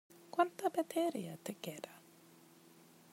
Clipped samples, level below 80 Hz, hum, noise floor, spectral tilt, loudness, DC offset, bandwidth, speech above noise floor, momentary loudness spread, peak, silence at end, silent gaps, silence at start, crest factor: under 0.1%; under -90 dBFS; none; -63 dBFS; -5 dB/octave; -39 LUFS; under 0.1%; 16 kHz; 25 dB; 16 LU; -18 dBFS; 1.15 s; none; 0.1 s; 24 dB